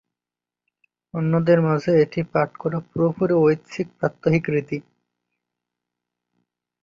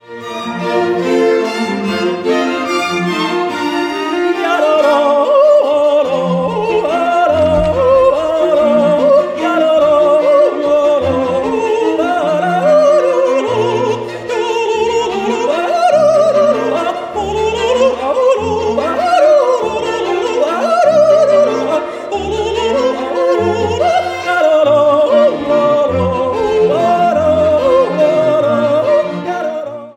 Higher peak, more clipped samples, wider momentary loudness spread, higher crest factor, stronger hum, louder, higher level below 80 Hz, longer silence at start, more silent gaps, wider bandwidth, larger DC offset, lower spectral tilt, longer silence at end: second, -6 dBFS vs 0 dBFS; neither; first, 10 LU vs 7 LU; first, 18 dB vs 12 dB; first, 60 Hz at -50 dBFS vs none; second, -21 LUFS vs -12 LUFS; second, -58 dBFS vs -42 dBFS; first, 1.15 s vs 0.1 s; neither; second, 7.4 kHz vs 11.5 kHz; neither; first, -8.5 dB/octave vs -5.5 dB/octave; first, 2.05 s vs 0.05 s